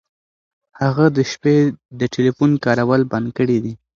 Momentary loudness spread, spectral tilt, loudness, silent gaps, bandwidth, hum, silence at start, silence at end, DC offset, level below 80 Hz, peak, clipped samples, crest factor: 6 LU; -7 dB/octave; -17 LUFS; 1.85-1.89 s; 7.4 kHz; none; 0.8 s; 0.25 s; under 0.1%; -54 dBFS; 0 dBFS; under 0.1%; 18 dB